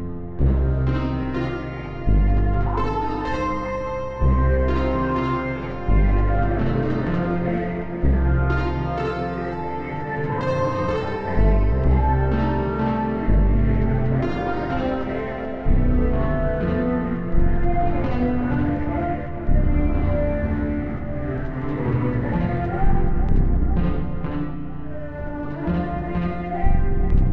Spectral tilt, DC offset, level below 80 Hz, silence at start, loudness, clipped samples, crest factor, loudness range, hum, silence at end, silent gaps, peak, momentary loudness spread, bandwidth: -9.5 dB/octave; 1%; -24 dBFS; 0 s; -23 LUFS; under 0.1%; 12 dB; 3 LU; none; 0 s; none; -8 dBFS; 7 LU; 6 kHz